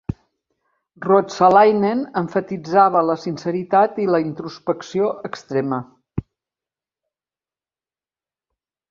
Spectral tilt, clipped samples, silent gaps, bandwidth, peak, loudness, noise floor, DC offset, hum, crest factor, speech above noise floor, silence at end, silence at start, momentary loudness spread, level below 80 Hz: -7 dB/octave; under 0.1%; none; 7.4 kHz; -2 dBFS; -18 LUFS; under -90 dBFS; under 0.1%; none; 18 dB; over 72 dB; 2.7 s; 0.1 s; 17 LU; -52 dBFS